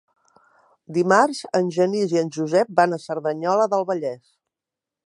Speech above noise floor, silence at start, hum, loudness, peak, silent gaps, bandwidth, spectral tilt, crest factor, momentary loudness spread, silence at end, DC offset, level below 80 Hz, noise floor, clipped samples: 67 dB; 0.9 s; none; -21 LUFS; -2 dBFS; none; 11.5 kHz; -5.5 dB/octave; 20 dB; 9 LU; 0.9 s; under 0.1%; -76 dBFS; -87 dBFS; under 0.1%